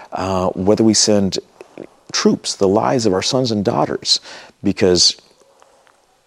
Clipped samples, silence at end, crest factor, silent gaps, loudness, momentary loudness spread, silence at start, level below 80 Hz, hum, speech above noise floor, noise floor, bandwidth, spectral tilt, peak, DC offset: under 0.1%; 1.1 s; 16 dB; none; -16 LUFS; 10 LU; 0 s; -52 dBFS; none; 38 dB; -54 dBFS; 12.5 kHz; -3.5 dB/octave; -2 dBFS; under 0.1%